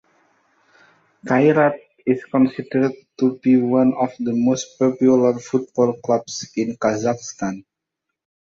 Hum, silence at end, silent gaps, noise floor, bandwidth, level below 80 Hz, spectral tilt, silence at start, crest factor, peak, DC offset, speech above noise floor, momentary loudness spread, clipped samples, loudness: none; 0.85 s; none; -81 dBFS; 7.4 kHz; -62 dBFS; -6 dB/octave; 1.25 s; 16 dB; -4 dBFS; under 0.1%; 62 dB; 11 LU; under 0.1%; -19 LUFS